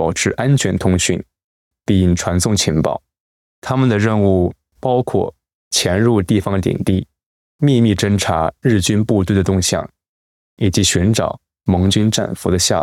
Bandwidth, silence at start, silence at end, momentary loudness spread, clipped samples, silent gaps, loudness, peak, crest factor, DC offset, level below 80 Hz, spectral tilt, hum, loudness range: 16 kHz; 0 s; 0 s; 8 LU; under 0.1%; 1.44-1.71 s, 3.20-3.62 s, 5.55-5.71 s, 7.26-7.59 s, 10.09-10.57 s; -16 LUFS; -4 dBFS; 12 dB; under 0.1%; -44 dBFS; -5 dB/octave; none; 2 LU